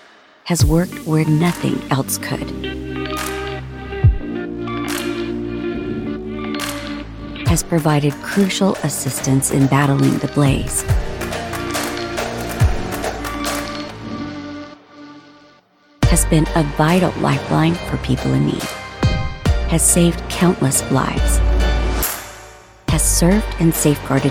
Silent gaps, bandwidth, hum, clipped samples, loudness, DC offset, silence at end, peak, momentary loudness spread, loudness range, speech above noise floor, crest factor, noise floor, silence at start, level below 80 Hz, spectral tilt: none; 17.5 kHz; none; under 0.1%; -18 LUFS; under 0.1%; 0 s; 0 dBFS; 12 LU; 6 LU; 36 dB; 18 dB; -52 dBFS; 0.45 s; -26 dBFS; -5 dB/octave